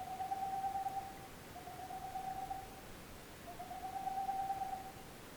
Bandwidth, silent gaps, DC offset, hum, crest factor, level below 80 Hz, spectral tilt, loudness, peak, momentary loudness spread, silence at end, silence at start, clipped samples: over 20 kHz; none; under 0.1%; none; 14 dB; -62 dBFS; -4 dB/octave; -44 LUFS; -30 dBFS; 12 LU; 0 s; 0 s; under 0.1%